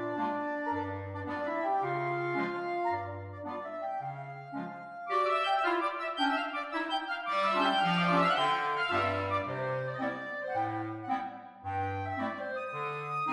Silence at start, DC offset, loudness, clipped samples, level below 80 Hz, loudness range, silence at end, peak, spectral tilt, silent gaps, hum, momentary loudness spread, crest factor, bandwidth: 0 s; under 0.1%; -32 LUFS; under 0.1%; -72 dBFS; 6 LU; 0 s; -14 dBFS; -6 dB/octave; none; none; 13 LU; 18 dB; 11.5 kHz